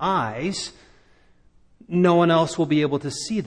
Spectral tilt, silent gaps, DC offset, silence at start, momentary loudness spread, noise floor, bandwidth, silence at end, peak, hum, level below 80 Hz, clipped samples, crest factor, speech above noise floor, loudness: -5.5 dB/octave; none; under 0.1%; 0 s; 10 LU; -55 dBFS; 10.5 kHz; 0 s; -6 dBFS; none; -56 dBFS; under 0.1%; 18 dB; 34 dB; -21 LUFS